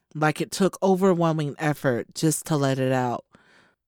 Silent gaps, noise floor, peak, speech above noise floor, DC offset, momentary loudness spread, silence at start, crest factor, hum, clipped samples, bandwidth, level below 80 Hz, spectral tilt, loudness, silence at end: none; -59 dBFS; -8 dBFS; 36 dB; under 0.1%; 5 LU; 0.15 s; 16 dB; none; under 0.1%; 19.5 kHz; -66 dBFS; -5.5 dB/octave; -24 LUFS; 0.7 s